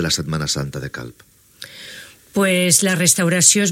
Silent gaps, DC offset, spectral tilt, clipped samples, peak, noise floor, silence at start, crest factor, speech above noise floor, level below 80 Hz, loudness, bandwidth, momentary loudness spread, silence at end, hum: none; under 0.1%; -3 dB/octave; under 0.1%; 0 dBFS; -41 dBFS; 0 s; 18 dB; 23 dB; -48 dBFS; -16 LUFS; 17 kHz; 23 LU; 0 s; none